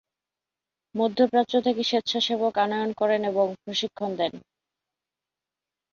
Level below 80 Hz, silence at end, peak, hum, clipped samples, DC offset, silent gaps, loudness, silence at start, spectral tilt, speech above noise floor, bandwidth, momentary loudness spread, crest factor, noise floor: -72 dBFS; 1.55 s; -8 dBFS; none; under 0.1%; under 0.1%; none; -25 LUFS; 0.95 s; -4.5 dB/octave; 65 dB; 7.2 kHz; 7 LU; 18 dB; -89 dBFS